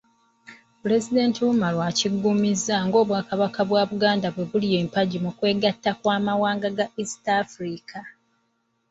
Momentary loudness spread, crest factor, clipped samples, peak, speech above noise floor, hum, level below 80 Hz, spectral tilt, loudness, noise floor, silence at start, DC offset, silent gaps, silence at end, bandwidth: 8 LU; 18 dB; under 0.1%; -6 dBFS; 48 dB; none; -64 dBFS; -5 dB/octave; -23 LUFS; -71 dBFS; 0.5 s; under 0.1%; none; 0.8 s; 8.2 kHz